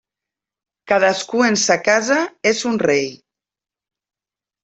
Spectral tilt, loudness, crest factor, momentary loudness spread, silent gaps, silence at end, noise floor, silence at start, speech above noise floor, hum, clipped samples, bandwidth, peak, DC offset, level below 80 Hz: -3 dB/octave; -17 LUFS; 18 dB; 5 LU; none; 1.5 s; -89 dBFS; 0.85 s; 73 dB; none; under 0.1%; 8.4 kHz; -2 dBFS; under 0.1%; -64 dBFS